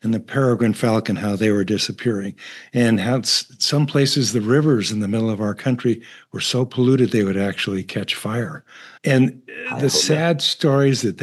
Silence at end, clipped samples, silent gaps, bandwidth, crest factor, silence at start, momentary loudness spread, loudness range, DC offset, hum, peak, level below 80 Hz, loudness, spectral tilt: 0 s; under 0.1%; none; 12.5 kHz; 16 dB; 0.05 s; 9 LU; 2 LU; under 0.1%; none; -2 dBFS; -68 dBFS; -19 LUFS; -5 dB/octave